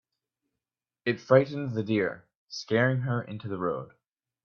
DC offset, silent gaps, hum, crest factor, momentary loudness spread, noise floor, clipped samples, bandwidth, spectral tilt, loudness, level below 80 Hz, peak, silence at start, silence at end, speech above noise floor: under 0.1%; 2.37-2.47 s; none; 22 dB; 17 LU; -90 dBFS; under 0.1%; 7 kHz; -7 dB/octave; -28 LUFS; -70 dBFS; -6 dBFS; 1.05 s; 0.6 s; 63 dB